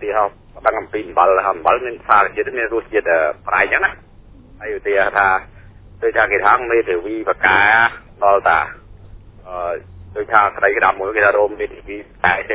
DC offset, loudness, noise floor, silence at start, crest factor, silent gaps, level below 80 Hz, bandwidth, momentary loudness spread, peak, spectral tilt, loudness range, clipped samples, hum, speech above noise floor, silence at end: under 0.1%; -16 LUFS; -42 dBFS; 0 s; 18 dB; none; -44 dBFS; 4 kHz; 13 LU; 0 dBFS; -7.5 dB/octave; 3 LU; under 0.1%; none; 26 dB; 0 s